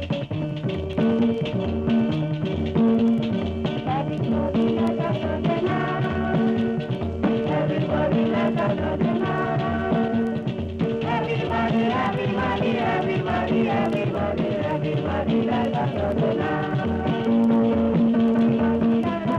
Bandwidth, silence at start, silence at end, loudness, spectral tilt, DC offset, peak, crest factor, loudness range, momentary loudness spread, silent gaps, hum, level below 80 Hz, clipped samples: 6.8 kHz; 0 s; 0 s; -23 LUFS; -8.5 dB/octave; under 0.1%; -10 dBFS; 12 dB; 2 LU; 6 LU; none; none; -44 dBFS; under 0.1%